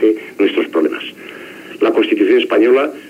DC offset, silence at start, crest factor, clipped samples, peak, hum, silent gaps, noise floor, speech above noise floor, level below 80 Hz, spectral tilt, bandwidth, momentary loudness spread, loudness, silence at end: under 0.1%; 0 s; 12 dB; under 0.1%; -2 dBFS; none; none; -33 dBFS; 20 dB; -70 dBFS; -5 dB/octave; 14 kHz; 20 LU; -14 LUFS; 0 s